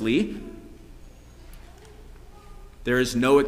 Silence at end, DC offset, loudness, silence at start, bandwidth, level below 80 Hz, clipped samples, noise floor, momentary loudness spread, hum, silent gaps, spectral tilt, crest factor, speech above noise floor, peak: 0 s; under 0.1%; -24 LUFS; 0 s; 16 kHz; -44 dBFS; under 0.1%; -46 dBFS; 27 LU; 60 Hz at -50 dBFS; none; -5 dB/octave; 20 dB; 24 dB; -8 dBFS